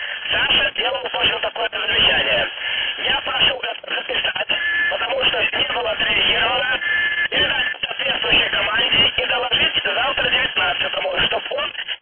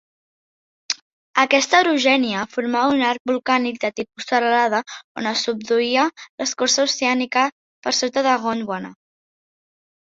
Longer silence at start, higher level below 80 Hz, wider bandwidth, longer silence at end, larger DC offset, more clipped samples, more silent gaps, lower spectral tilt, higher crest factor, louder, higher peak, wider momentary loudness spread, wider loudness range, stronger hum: second, 0 s vs 0.9 s; first, -46 dBFS vs -66 dBFS; second, 4.4 kHz vs 8 kHz; second, 0.05 s vs 1.15 s; neither; neither; second, none vs 1.02-1.34 s, 3.20-3.25 s, 5.04-5.15 s, 6.29-6.38 s, 7.52-7.82 s; first, -5 dB/octave vs -2 dB/octave; second, 14 dB vs 20 dB; first, -17 LUFS vs -20 LUFS; about the same, -4 dBFS vs -2 dBFS; second, 7 LU vs 11 LU; about the same, 2 LU vs 2 LU; neither